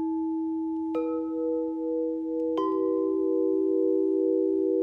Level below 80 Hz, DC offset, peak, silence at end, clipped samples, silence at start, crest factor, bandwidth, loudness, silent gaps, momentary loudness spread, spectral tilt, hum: -68 dBFS; under 0.1%; -16 dBFS; 0 s; under 0.1%; 0 s; 10 dB; 3.4 kHz; -27 LUFS; none; 5 LU; -8.5 dB/octave; none